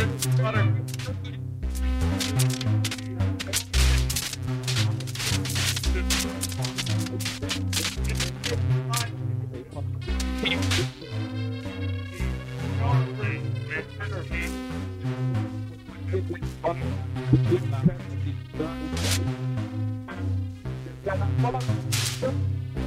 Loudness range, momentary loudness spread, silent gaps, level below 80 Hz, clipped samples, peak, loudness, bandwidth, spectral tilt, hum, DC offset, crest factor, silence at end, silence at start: 4 LU; 9 LU; none; -36 dBFS; under 0.1%; -8 dBFS; -27 LUFS; 16 kHz; -4.5 dB/octave; none; under 0.1%; 20 dB; 0 s; 0 s